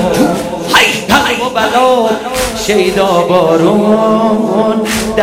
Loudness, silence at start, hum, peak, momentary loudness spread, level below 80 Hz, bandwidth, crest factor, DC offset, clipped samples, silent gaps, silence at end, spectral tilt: -10 LUFS; 0 s; none; 0 dBFS; 5 LU; -36 dBFS; 16.5 kHz; 10 dB; under 0.1%; 0.2%; none; 0 s; -4 dB/octave